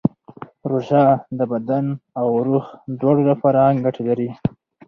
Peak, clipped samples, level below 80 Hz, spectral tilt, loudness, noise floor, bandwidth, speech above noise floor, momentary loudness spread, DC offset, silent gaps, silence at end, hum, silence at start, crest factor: -2 dBFS; under 0.1%; -56 dBFS; -10.5 dB/octave; -19 LUFS; -40 dBFS; 6.2 kHz; 22 dB; 11 LU; under 0.1%; none; 0.4 s; none; 0.05 s; 16 dB